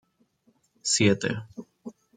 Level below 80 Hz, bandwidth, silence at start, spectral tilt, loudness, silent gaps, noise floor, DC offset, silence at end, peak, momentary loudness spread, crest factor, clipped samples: -64 dBFS; 9.6 kHz; 0.85 s; -3.5 dB/octave; -25 LUFS; none; -67 dBFS; under 0.1%; 0.25 s; -8 dBFS; 23 LU; 22 dB; under 0.1%